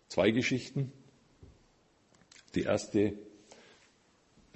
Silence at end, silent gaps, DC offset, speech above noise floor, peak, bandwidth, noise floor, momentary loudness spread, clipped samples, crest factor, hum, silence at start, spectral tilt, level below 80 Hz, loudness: 1.25 s; none; under 0.1%; 37 dB; -12 dBFS; 8.6 kHz; -68 dBFS; 14 LU; under 0.1%; 24 dB; none; 0.1 s; -5.5 dB/octave; -62 dBFS; -32 LUFS